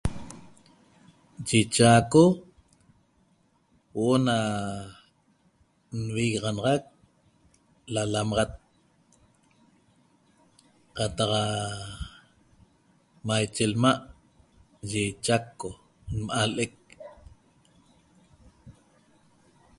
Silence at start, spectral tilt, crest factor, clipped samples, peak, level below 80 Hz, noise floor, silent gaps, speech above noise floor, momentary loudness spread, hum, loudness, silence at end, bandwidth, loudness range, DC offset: 0.05 s; -5 dB/octave; 24 dB; under 0.1%; -6 dBFS; -50 dBFS; -66 dBFS; none; 41 dB; 23 LU; none; -26 LUFS; 1.1 s; 11.5 kHz; 9 LU; under 0.1%